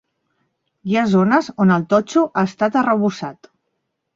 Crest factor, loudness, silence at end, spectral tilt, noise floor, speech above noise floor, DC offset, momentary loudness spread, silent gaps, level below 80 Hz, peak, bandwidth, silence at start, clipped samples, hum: 16 dB; -17 LUFS; 0.8 s; -7 dB/octave; -74 dBFS; 57 dB; under 0.1%; 10 LU; none; -60 dBFS; -2 dBFS; 7.6 kHz; 0.85 s; under 0.1%; none